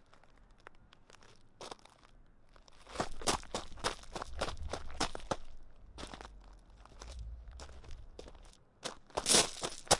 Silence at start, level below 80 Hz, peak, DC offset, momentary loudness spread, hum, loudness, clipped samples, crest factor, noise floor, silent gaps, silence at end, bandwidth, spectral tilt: 0 s; -52 dBFS; -8 dBFS; under 0.1%; 24 LU; none; -36 LUFS; under 0.1%; 32 dB; -60 dBFS; none; 0 s; 11.5 kHz; -1.5 dB/octave